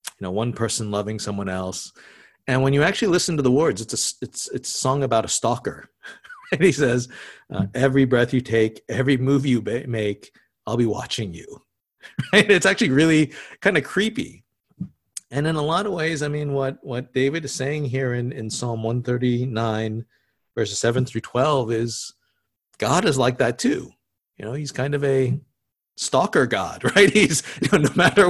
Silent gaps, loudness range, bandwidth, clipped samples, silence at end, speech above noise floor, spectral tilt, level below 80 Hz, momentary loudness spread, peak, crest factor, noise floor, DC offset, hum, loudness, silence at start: none; 5 LU; 12.5 kHz; under 0.1%; 0 s; 52 dB; -4.5 dB/octave; -52 dBFS; 15 LU; 0 dBFS; 22 dB; -73 dBFS; under 0.1%; none; -21 LUFS; 0.05 s